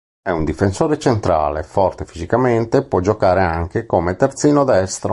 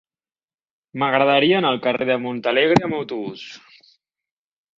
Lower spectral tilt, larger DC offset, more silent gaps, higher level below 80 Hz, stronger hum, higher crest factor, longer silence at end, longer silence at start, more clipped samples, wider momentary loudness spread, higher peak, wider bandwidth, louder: about the same, -6.5 dB/octave vs -6 dB/octave; neither; neither; first, -34 dBFS vs -60 dBFS; neither; second, 14 dB vs 20 dB; second, 0 s vs 1.2 s; second, 0.25 s vs 0.95 s; neither; second, 6 LU vs 17 LU; about the same, -2 dBFS vs -2 dBFS; first, 11.5 kHz vs 7.8 kHz; about the same, -17 LUFS vs -19 LUFS